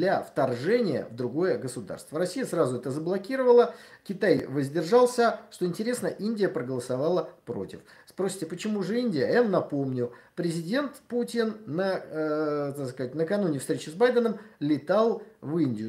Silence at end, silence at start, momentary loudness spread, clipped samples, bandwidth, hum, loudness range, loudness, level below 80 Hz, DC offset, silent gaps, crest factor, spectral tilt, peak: 0 s; 0 s; 10 LU; under 0.1%; 15.5 kHz; none; 5 LU; -27 LUFS; -72 dBFS; under 0.1%; none; 18 dB; -6 dB/octave; -8 dBFS